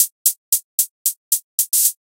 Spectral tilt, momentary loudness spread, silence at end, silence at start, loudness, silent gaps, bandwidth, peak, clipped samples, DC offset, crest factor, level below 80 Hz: 12.5 dB/octave; 6 LU; 0.2 s; 0 s; -17 LUFS; 0.12-0.25 s, 0.37-0.52 s, 0.64-0.78 s, 0.90-1.05 s, 1.17-1.31 s, 1.43-1.58 s; 17.5 kHz; 0 dBFS; under 0.1%; under 0.1%; 20 dB; under -90 dBFS